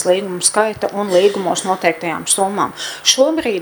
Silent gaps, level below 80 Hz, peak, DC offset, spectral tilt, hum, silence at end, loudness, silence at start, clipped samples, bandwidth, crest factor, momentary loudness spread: none; -56 dBFS; 0 dBFS; under 0.1%; -2 dB/octave; none; 0 s; -16 LUFS; 0 s; under 0.1%; over 20 kHz; 16 dB; 7 LU